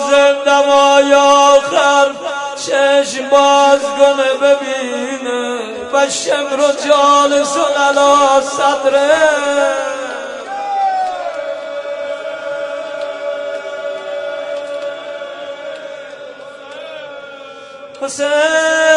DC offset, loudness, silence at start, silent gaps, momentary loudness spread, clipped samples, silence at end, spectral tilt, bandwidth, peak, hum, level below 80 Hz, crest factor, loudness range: under 0.1%; -13 LUFS; 0 s; none; 19 LU; 0.1%; 0 s; -1 dB/octave; 11 kHz; 0 dBFS; none; -60 dBFS; 14 dB; 14 LU